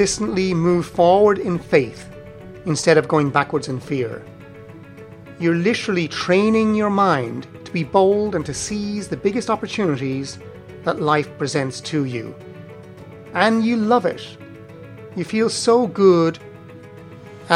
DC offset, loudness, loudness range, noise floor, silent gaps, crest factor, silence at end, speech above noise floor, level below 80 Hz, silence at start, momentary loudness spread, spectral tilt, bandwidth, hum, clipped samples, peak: under 0.1%; -19 LUFS; 4 LU; -39 dBFS; none; 20 dB; 0 s; 21 dB; -52 dBFS; 0 s; 24 LU; -5.5 dB/octave; 12 kHz; none; under 0.1%; 0 dBFS